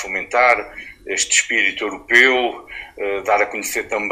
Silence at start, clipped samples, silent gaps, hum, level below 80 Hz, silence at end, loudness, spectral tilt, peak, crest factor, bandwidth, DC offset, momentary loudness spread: 0 s; under 0.1%; none; none; -52 dBFS; 0 s; -17 LUFS; 0 dB/octave; 0 dBFS; 18 dB; 16 kHz; under 0.1%; 16 LU